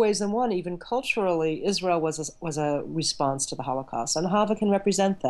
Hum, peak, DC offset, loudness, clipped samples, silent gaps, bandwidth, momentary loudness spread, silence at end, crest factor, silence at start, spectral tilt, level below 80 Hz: none; -12 dBFS; under 0.1%; -26 LUFS; under 0.1%; none; 12.5 kHz; 6 LU; 0 s; 14 dB; 0 s; -4 dB/octave; -58 dBFS